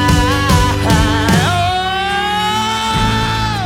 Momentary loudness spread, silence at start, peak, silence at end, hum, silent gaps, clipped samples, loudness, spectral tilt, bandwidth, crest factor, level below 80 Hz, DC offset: 3 LU; 0 s; 0 dBFS; 0 s; none; none; under 0.1%; -14 LUFS; -4.5 dB/octave; 18.5 kHz; 14 dB; -24 dBFS; under 0.1%